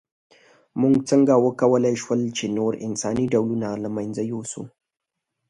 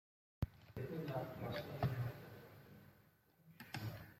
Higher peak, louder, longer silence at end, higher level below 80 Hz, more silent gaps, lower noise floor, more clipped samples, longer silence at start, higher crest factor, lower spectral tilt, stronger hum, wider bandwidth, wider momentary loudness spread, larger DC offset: first, -4 dBFS vs -26 dBFS; first, -22 LUFS vs -46 LUFS; first, 0.8 s vs 0 s; first, -58 dBFS vs -64 dBFS; neither; first, -83 dBFS vs -71 dBFS; neither; first, 0.75 s vs 0.4 s; about the same, 18 dB vs 20 dB; about the same, -6 dB/octave vs -7 dB/octave; neither; second, 11 kHz vs 16.5 kHz; second, 13 LU vs 19 LU; neither